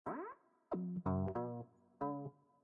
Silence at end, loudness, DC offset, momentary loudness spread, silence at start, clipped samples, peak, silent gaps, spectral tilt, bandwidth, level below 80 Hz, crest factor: 0.3 s; -44 LUFS; under 0.1%; 14 LU; 0.05 s; under 0.1%; -26 dBFS; none; -11.5 dB/octave; 3.7 kHz; -72 dBFS; 16 dB